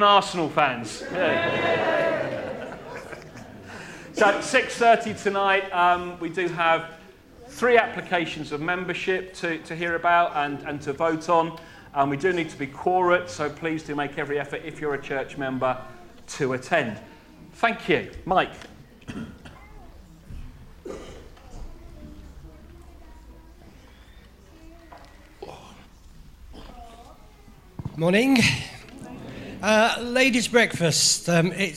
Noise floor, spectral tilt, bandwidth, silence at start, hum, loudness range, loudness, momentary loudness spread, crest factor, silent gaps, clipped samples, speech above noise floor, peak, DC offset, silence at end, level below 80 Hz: -49 dBFS; -4 dB/octave; 15.5 kHz; 0 s; none; 20 LU; -23 LUFS; 23 LU; 24 dB; none; under 0.1%; 26 dB; -2 dBFS; under 0.1%; 0 s; -50 dBFS